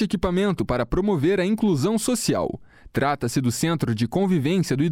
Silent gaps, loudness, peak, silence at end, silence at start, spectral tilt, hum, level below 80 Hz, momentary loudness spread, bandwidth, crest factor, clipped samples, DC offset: none; -23 LUFS; -10 dBFS; 0 s; 0 s; -6 dB/octave; none; -42 dBFS; 4 LU; 16.5 kHz; 12 dB; under 0.1%; under 0.1%